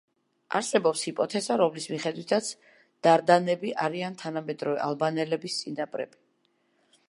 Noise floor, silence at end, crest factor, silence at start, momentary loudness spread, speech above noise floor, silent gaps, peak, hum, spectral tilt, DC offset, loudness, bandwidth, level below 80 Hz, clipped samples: -71 dBFS; 1 s; 22 dB; 0.5 s; 11 LU; 44 dB; none; -6 dBFS; none; -4.5 dB/octave; under 0.1%; -27 LUFS; 11.5 kHz; -82 dBFS; under 0.1%